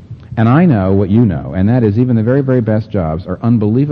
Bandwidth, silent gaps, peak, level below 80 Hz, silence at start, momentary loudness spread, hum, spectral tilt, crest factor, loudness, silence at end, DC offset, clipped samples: 4.9 kHz; none; 0 dBFS; -38 dBFS; 0 s; 8 LU; none; -11.5 dB/octave; 10 dB; -13 LUFS; 0 s; under 0.1%; under 0.1%